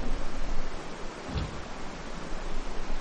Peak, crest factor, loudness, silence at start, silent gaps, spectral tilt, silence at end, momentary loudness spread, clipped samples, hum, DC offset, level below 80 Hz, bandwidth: -14 dBFS; 14 dB; -38 LUFS; 0 s; none; -5 dB/octave; 0 s; 5 LU; under 0.1%; none; under 0.1%; -32 dBFS; 8.6 kHz